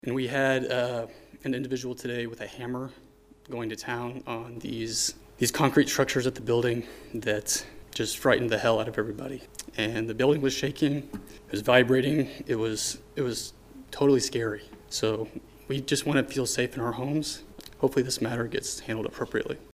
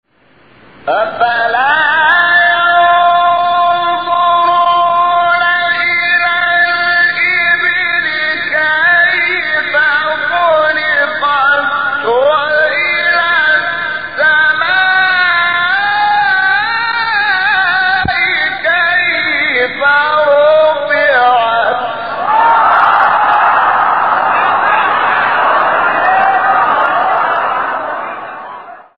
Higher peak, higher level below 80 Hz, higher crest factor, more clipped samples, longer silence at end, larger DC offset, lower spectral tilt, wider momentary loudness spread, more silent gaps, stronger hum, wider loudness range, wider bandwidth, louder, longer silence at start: second, -4 dBFS vs 0 dBFS; second, -56 dBFS vs -50 dBFS; first, 24 dB vs 12 dB; neither; about the same, 0.05 s vs 0.15 s; second, under 0.1% vs 0.8%; second, -4 dB/octave vs -5.5 dB/octave; first, 14 LU vs 5 LU; neither; neither; first, 7 LU vs 1 LU; first, 15.5 kHz vs 5.2 kHz; second, -28 LUFS vs -10 LUFS; second, 0.05 s vs 0.85 s